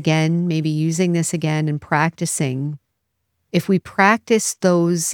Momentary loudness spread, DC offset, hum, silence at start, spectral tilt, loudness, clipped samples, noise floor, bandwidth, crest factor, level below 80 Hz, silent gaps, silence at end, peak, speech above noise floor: 7 LU; under 0.1%; none; 0 s; -5 dB/octave; -19 LUFS; under 0.1%; -74 dBFS; 18 kHz; 18 dB; -62 dBFS; none; 0 s; 0 dBFS; 55 dB